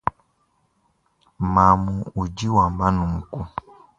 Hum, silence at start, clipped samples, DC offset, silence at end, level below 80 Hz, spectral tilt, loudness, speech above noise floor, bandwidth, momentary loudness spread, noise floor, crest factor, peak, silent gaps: none; 0.05 s; under 0.1%; under 0.1%; 0.4 s; -38 dBFS; -7.5 dB/octave; -21 LUFS; 46 dB; 7.8 kHz; 15 LU; -67 dBFS; 22 dB; -2 dBFS; none